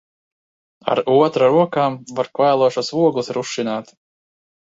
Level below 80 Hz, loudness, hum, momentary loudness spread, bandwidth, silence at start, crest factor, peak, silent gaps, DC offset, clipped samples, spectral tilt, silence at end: -66 dBFS; -18 LUFS; none; 10 LU; 7.8 kHz; 0.85 s; 18 dB; -2 dBFS; none; under 0.1%; under 0.1%; -5.5 dB/octave; 0.85 s